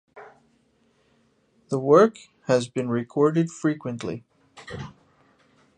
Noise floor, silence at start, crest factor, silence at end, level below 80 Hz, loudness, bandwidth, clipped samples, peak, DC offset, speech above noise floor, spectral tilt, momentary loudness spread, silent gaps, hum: -65 dBFS; 0.15 s; 22 dB; 0.85 s; -62 dBFS; -23 LUFS; 9.6 kHz; under 0.1%; -4 dBFS; under 0.1%; 42 dB; -6.5 dB/octave; 21 LU; none; none